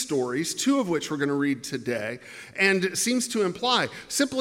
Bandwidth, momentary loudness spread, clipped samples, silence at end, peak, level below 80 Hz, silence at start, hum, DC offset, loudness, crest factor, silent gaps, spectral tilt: 16.5 kHz; 8 LU; under 0.1%; 0 s; -8 dBFS; -68 dBFS; 0 s; none; under 0.1%; -25 LUFS; 18 dB; none; -3 dB/octave